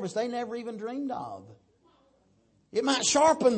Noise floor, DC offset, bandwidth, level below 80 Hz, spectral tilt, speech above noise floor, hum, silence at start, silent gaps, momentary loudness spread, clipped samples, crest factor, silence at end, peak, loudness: -67 dBFS; under 0.1%; 8.8 kHz; -68 dBFS; -2.5 dB/octave; 39 dB; none; 0 s; none; 15 LU; under 0.1%; 18 dB; 0 s; -10 dBFS; -28 LUFS